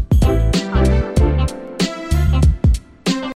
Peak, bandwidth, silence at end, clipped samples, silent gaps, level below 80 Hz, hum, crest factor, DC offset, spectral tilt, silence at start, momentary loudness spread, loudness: -2 dBFS; 14 kHz; 0 s; under 0.1%; none; -18 dBFS; none; 12 dB; under 0.1%; -6.5 dB/octave; 0 s; 7 LU; -17 LUFS